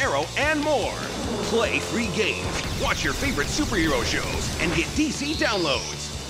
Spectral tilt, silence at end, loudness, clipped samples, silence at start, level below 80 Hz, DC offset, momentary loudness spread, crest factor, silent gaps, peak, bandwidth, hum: -3.5 dB/octave; 0 s; -24 LUFS; under 0.1%; 0 s; -38 dBFS; under 0.1%; 5 LU; 16 dB; none; -10 dBFS; 16 kHz; none